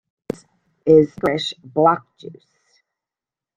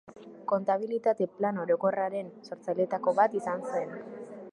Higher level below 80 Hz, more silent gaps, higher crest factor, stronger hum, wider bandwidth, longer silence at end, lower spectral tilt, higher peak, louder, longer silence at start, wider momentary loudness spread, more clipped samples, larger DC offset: first, -56 dBFS vs -80 dBFS; neither; about the same, 20 dB vs 20 dB; neither; second, 9.4 kHz vs 11 kHz; first, 1.25 s vs 0 s; about the same, -6.5 dB/octave vs -7.5 dB/octave; first, -2 dBFS vs -10 dBFS; first, -18 LUFS vs -29 LUFS; first, 0.85 s vs 0.05 s; first, 25 LU vs 16 LU; neither; neither